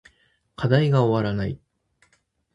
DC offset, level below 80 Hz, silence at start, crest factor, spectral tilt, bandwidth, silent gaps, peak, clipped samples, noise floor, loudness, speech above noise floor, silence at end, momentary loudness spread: under 0.1%; -50 dBFS; 0.6 s; 20 dB; -8.5 dB/octave; 7.8 kHz; none; -4 dBFS; under 0.1%; -67 dBFS; -22 LUFS; 46 dB; 1 s; 12 LU